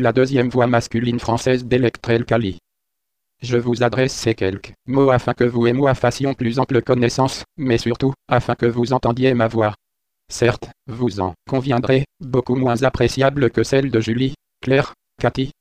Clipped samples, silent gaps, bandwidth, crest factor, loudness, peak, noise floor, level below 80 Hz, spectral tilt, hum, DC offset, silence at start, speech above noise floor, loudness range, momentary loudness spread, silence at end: under 0.1%; none; 13.5 kHz; 16 dB; -19 LUFS; -2 dBFS; -80 dBFS; -44 dBFS; -6.5 dB/octave; none; under 0.1%; 0 s; 62 dB; 2 LU; 7 LU; 0.1 s